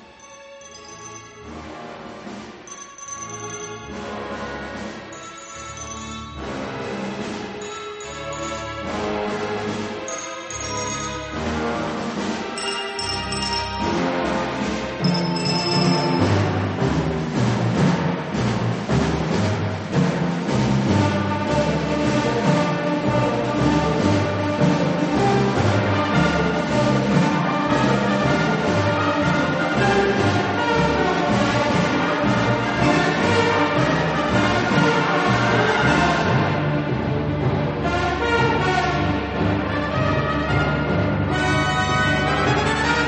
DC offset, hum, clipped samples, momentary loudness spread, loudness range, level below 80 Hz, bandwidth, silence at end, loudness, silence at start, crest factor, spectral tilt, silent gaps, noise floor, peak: under 0.1%; none; under 0.1%; 13 LU; 12 LU; -40 dBFS; 8.8 kHz; 0 s; -21 LUFS; 0 s; 18 dB; -5.5 dB/octave; none; -43 dBFS; -4 dBFS